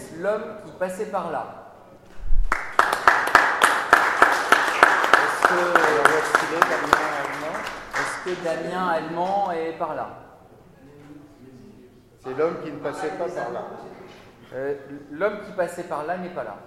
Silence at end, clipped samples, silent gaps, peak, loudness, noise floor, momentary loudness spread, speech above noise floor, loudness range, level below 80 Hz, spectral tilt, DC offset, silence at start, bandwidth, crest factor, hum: 0 s; under 0.1%; none; 0 dBFS; -22 LUFS; -50 dBFS; 16 LU; 25 dB; 14 LU; -36 dBFS; -3 dB/octave; under 0.1%; 0 s; 16 kHz; 22 dB; none